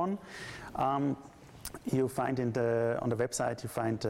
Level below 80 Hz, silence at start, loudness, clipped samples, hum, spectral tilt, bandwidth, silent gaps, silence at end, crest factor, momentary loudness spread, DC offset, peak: -60 dBFS; 0 s; -33 LUFS; under 0.1%; none; -6 dB/octave; 16 kHz; none; 0 s; 14 dB; 13 LU; under 0.1%; -18 dBFS